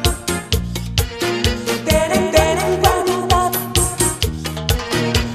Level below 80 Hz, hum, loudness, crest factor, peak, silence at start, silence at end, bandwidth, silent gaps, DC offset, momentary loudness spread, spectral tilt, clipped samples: -26 dBFS; none; -17 LUFS; 16 dB; -2 dBFS; 0 s; 0 s; 14 kHz; none; under 0.1%; 6 LU; -4 dB/octave; under 0.1%